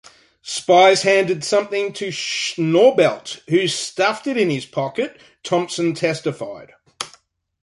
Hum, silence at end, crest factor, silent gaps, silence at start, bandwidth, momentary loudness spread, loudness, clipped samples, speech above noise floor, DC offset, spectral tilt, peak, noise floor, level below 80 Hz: none; 0.55 s; 18 dB; none; 0.45 s; 11.5 kHz; 19 LU; -18 LUFS; under 0.1%; 36 dB; under 0.1%; -4 dB/octave; -2 dBFS; -55 dBFS; -66 dBFS